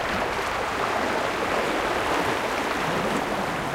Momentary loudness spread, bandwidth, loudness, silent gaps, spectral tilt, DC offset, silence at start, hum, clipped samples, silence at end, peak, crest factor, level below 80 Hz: 2 LU; 16 kHz; -25 LUFS; none; -4 dB/octave; under 0.1%; 0 s; none; under 0.1%; 0 s; -10 dBFS; 14 dB; -46 dBFS